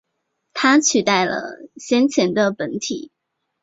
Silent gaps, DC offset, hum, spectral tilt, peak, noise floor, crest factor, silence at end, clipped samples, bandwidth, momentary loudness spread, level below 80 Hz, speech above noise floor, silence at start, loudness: none; under 0.1%; none; -3 dB/octave; -2 dBFS; -74 dBFS; 18 dB; 0.55 s; under 0.1%; 7.8 kHz; 16 LU; -64 dBFS; 56 dB; 0.55 s; -18 LUFS